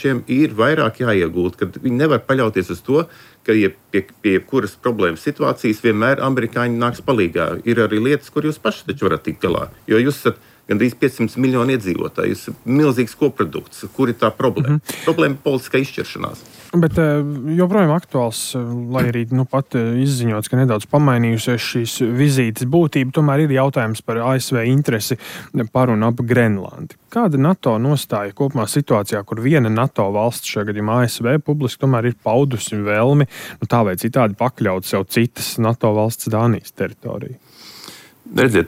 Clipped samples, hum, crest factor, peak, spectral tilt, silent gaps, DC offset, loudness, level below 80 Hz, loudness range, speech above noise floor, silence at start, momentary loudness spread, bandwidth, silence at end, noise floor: under 0.1%; none; 14 dB; -4 dBFS; -6.5 dB/octave; none; under 0.1%; -18 LUFS; -52 dBFS; 2 LU; 22 dB; 0 s; 8 LU; 16.5 kHz; 0 s; -40 dBFS